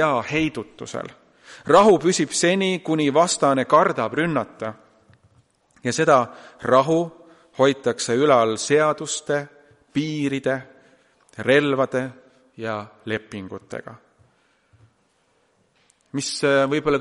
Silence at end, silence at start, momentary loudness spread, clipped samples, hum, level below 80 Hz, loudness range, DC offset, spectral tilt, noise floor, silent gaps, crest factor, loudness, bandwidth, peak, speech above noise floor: 0 s; 0 s; 16 LU; under 0.1%; none; -60 dBFS; 15 LU; under 0.1%; -4.5 dB/octave; -65 dBFS; none; 20 dB; -20 LUFS; 11.5 kHz; -2 dBFS; 44 dB